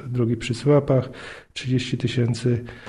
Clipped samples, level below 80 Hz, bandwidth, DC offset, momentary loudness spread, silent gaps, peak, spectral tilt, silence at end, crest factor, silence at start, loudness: under 0.1%; -50 dBFS; 11 kHz; under 0.1%; 15 LU; none; -8 dBFS; -7 dB/octave; 0 s; 16 dB; 0 s; -23 LUFS